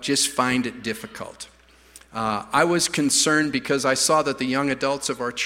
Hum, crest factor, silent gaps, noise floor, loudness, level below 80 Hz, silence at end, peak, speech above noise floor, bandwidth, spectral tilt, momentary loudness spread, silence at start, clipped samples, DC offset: none; 20 dB; none; -50 dBFS; -21 LUFS; -58 dBFS; 0 s; -4 dBFS; 28 dB; 16.5 kHz; -2.5 dB/octave; 17 LU; 0 s; under 0.1%; under 0.1%